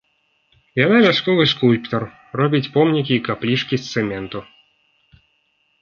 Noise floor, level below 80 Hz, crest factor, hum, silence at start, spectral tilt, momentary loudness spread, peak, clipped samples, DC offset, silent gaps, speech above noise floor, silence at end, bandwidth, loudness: -65 dBFS; -56 dBFS; 18 dB; none; 0.75 s; -6.5 dB/octave; 13 LU; 0 dBFS; under 0.1%; under 0.1%; none; 47 dB; 1.4 s; 7 kHz; -18 LUFS